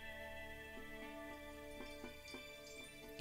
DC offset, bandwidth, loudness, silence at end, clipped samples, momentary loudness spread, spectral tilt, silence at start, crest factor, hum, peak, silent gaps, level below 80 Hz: under 0.1%; 16 kHz; -52 LUFS; 0 s; under 0.1%; 3 LU; -3.5 dB/octave; 0 s; 24 dB; none; -28 dBFS; none; -62 dBFS